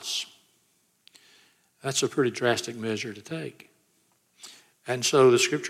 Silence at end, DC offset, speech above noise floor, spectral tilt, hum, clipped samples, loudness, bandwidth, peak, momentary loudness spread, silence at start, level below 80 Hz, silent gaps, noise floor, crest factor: 0 s; under 0.1%; 43 dB; -3.5 dB/octave; none; under 0.1%; -25 LUFS; 15.5 kHz; -8 dBFS; 26 LU; 0 s; -78 dBFS; none; -68 dBFS; 20 dB